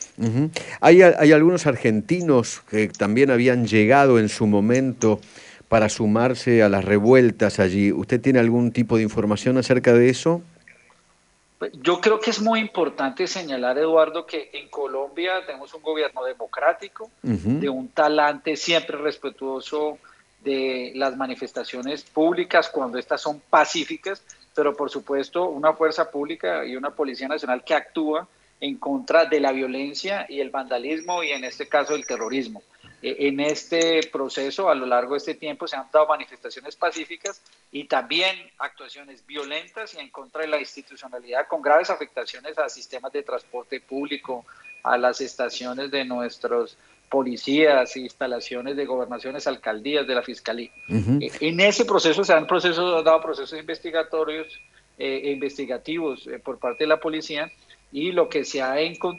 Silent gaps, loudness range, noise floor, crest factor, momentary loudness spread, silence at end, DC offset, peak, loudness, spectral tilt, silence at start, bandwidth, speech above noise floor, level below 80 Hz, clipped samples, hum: none; 9 LU; -61 dBFS; 20 dB; 14 LU; 0 s; under 0.1%; -2 dBFS; -22 LUFS; -5 dB/octave; 0 s; 11 kHz; 39 dB; -60 dBFS; under 0.1%; none